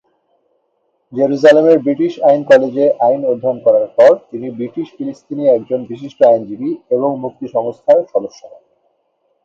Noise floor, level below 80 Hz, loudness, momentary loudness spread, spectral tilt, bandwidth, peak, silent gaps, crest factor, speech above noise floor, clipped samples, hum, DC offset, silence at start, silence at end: -64 dBFS; -66 dBFS; -14 LUFS; 14 LU; -7 dB/octave; 7.6 kHz; 0 dBFS; none; 14 dB; 51 dB; under 0.1%; none; under 0.1%; 1.1 s; 1 s